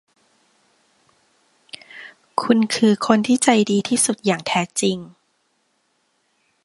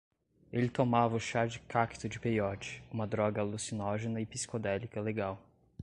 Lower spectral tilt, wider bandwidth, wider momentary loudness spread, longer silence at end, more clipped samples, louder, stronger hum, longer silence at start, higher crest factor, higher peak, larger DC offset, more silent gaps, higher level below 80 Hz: second, -4 dB/octave vs -5.5 dB/octave; about the same, 11.5 kHz vs 11 kHz; first, 22 LU vs 9 LU; first, 1.55 s vs 0 s; neither; first, -18 LUFS vs -34 LUFS; neither; first, 1.95 s vs 0.5 s; about the same, 22 dB vs 22 dB; first, 0 dBFS vs -14 dBFS; neither; neither; about the same, -66 dBFS vs -62 dBFS